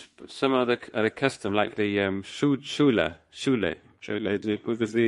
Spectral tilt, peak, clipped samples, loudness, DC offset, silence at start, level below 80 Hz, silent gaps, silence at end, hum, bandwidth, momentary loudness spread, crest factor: -5.5 dB/octave; -6 dBFS; under 0.1%; -26 LUFS; under 0.1%; 0 s; -58 dBFS; none; 0 s; none; 11.5 kHz; 8 LU; 20 dB